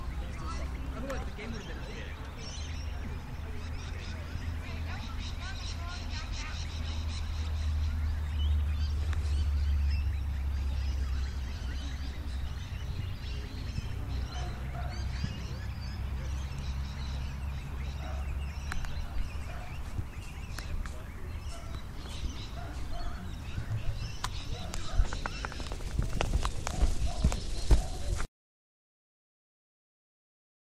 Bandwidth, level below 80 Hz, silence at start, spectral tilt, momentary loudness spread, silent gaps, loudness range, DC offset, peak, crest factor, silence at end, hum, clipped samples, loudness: 13.5 kHz; -36 dBFS; 0 s; -5 dB/octave; 9 LU; none; 8 LU; under 0.1%; -10 dBFS; 24 dB; 2.55 s; none; under 0.1%; -37 LUFS